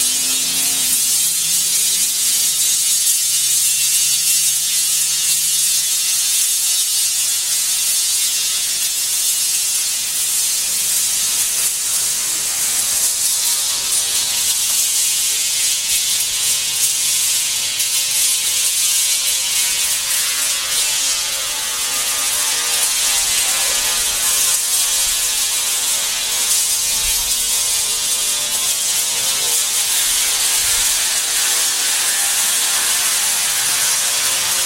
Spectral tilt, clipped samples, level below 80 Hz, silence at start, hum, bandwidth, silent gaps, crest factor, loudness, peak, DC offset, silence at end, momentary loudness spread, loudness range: 2.5 dB/octave; under 0.1%; -50 dBFS; 0 s; none; 16 kHz; none; 16 dB; -14 LUFS; -2 dBFS; 0.1%; 0 s; 3 LU; 2 LU